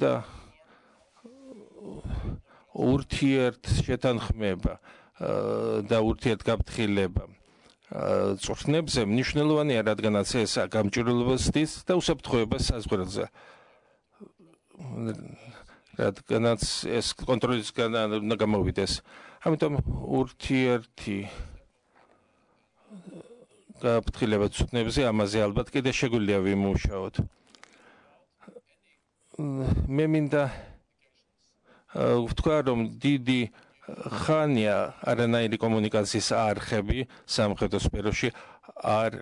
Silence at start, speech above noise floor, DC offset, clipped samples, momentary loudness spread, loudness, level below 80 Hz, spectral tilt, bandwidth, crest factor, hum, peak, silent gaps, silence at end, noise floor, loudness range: 0 s; 43 dB; under 0.1%; under 0.1%; 13 LU; -27 LUFS; -42 dBFS; -5.5 dB/octave; 11 kHz; 18 dB; none; -10 dBFS; none; 0 s; -70 dBFS; 6 LU